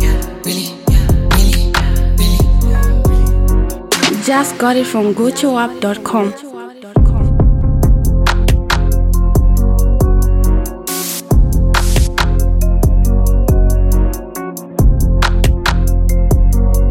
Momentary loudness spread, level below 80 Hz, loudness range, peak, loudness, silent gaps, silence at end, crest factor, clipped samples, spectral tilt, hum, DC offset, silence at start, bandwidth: 6 LU; -12 dBFS; 1 LU; 0 dBFS; -14 LUFS; none; 0 s; 10 dB; under 0.1%; -5.5 dB/octave; none; under 0.1%; 0 s; 16 kHz